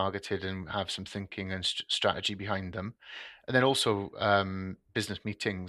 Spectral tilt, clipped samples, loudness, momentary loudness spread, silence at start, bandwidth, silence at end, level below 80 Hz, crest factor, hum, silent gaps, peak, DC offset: -4 dB/octave; under 0.1%; -31 LUFS; 12 LU; 0 s; 13 kHz; 0 s; -62 dBFS; 22 dB; none; none; -10 dBFS; under 0.1%